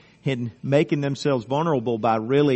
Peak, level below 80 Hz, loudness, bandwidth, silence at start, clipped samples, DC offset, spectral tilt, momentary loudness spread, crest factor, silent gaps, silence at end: -6 dBFS; -62 dBFS; -23 LUFS; 8.4 kHz; 0.25 s; under 0.1%; under 0.1%; -7 dB/octave; 7 LU; 16 dB; none; 0 s